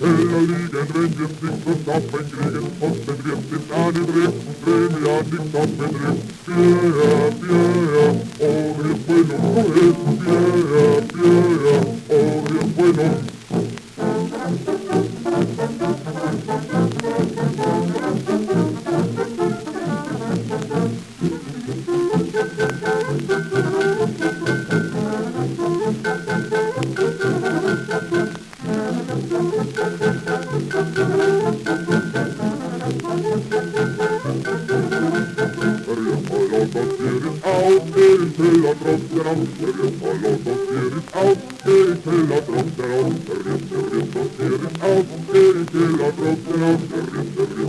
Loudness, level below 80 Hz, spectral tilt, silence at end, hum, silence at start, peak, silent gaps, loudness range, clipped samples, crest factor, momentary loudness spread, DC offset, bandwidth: -20 LUFS; -54 dBFS; -7 dB/octave; 0 s; none; 0 s; -2 dBFS; none; 6 LU; under 0.1%; 18 dB; 9 LU; under 0.1%; 12.5 kHz